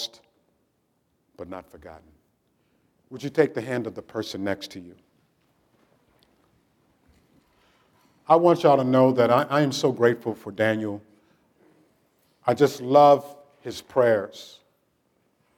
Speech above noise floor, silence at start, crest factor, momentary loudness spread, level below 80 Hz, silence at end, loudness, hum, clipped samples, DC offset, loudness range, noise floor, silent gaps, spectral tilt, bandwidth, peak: 49 dB; 0 s; 22 dB; 22 LU; -72 dBFS; 1.1 s; -22 LUFS; none; under 0.1%; under 0.1%; 14 LU; -71 dBFS; none; -6 dB/octave; 17.5 kHz; -4 dBFS